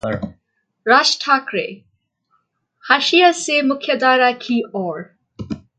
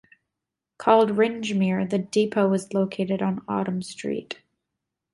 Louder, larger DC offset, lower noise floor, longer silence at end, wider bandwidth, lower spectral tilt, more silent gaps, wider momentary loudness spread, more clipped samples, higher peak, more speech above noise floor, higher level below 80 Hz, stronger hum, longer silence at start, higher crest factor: first, -16 LUFS vs -24 LUFS; neither; second, -66 dBFS vs -86 dBFS; second, 0.2 s vs 0.8 s; second, 9.4 kHz vs 11.5 kHz; second, -3 dB/octave vs -6.5 dB/octave; neither; first, 18 LU vs 11 LU; neither; first, 0 dBFS vs -4 dBFS; second, 49 dB vs 62 dB; first, -54 dBFS vs -66 dBFS; neither; second, 0.05 s vs 0.8 s; about the same, 18 dB vs 22 dB